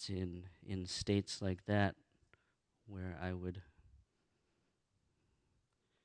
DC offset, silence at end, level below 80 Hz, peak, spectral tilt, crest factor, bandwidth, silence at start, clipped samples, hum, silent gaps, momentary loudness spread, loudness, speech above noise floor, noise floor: under 0.1%; 2.1 s; -66 dBFS; -20 dBFS; -5.5 dB/octave; 24 dB; 10 kHz; 0 s; under 0.1%; none; none; 16 LU; -41 LUFS; 42 dB; -82 dBFS